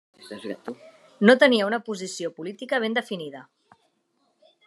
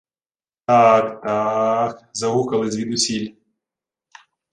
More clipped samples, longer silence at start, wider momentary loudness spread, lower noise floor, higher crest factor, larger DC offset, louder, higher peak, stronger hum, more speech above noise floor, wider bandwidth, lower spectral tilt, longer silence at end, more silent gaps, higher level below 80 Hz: neither; second, 0.2 s vs 0.7 s; first, 22 LU vs 12 LU; second, -71 dBFS vs under -90 dBFS; first, 24 dB vs 18 dB; neither; second, -22 LUFS vs -19 LUFS; about the same, -2 dBFS vs -2 dBFS; neither; second, 47 dB vs over 72 dB; about the same, 12 kHz vs 11 kHz; about the same, -4.5 dB/octave vs -4 dB/octave; about the same, 1.25 s vs 1.2 s; neither; second, -86 dBFS vs -62 dBFS